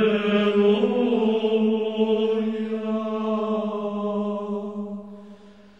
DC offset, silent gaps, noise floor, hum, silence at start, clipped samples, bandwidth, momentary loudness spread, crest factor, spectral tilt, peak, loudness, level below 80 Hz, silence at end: 0.2%; none; -47 dBFS; none; 0 s; under 0.1%; 6.8 kHz; 12 LU; 14 dB; -8 dB/octave; -8 dBFS; -23 LUFS; -64 dBFS; 0.25 s